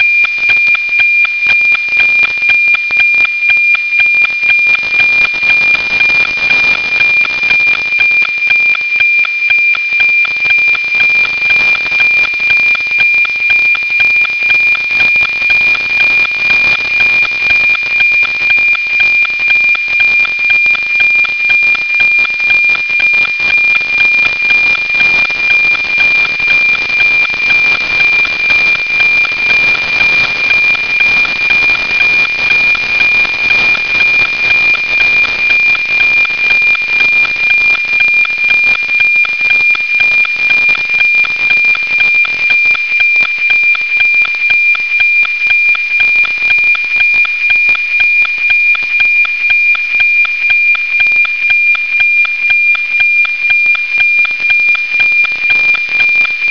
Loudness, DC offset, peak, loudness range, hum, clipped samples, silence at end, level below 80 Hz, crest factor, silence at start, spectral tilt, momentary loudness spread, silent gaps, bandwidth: -7 LUFS; 1%; 0 dBFS; 1 LU; none; under 0.1%; 0 s; -46 dBFS; 10 dB; 0 s; -1 dB/octave; 1 LU; none; 5.4 kHz